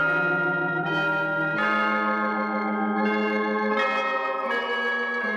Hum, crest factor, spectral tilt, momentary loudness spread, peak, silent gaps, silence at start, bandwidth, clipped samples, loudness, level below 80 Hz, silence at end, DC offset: none; 12 dB; -6.5 dB/octave; 3 LU; -12 dBFS; none; 0 s; 8 kHz; under 0.1%; -24 LUFS; -78 dBFS; 0 s; under 0.1%